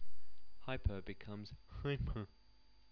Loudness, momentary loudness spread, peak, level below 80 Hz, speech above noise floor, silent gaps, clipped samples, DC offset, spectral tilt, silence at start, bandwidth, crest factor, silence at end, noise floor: -45 LUFS; 12 LU; -24 dBFS; -50 dBFS; 28 dB; none; under 0.1%; under 0.1%; -8.5 dB/octave; 0 s; 5.4 kHz; 16 dB; 0 s; -69 dBFS